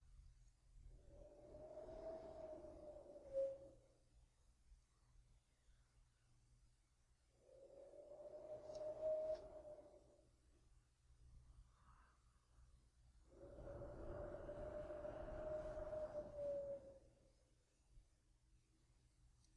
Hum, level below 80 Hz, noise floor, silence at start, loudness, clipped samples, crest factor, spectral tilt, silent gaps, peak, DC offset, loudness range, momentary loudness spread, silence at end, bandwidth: none; -68 dBFS; -79 dBFS; 0 s; -52 LUFS; under 0.1%; 18 dB; -7 dB/octave; none; -36 dBFS; under 0.1%; 11 LU; 19 LU; 0 s; 10.5 kHz